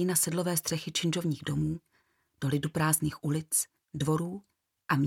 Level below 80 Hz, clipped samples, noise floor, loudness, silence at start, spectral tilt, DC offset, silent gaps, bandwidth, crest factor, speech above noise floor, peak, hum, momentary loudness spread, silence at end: -60 dBFS; under 0.1%; -72 dBFS; -30 LUFS; 0 s; -4.5 dB/octave; under 0.1%; none; 17 kHz; 20 dB; 42 dB; -10 dBFS; none; 10 LU; 0 s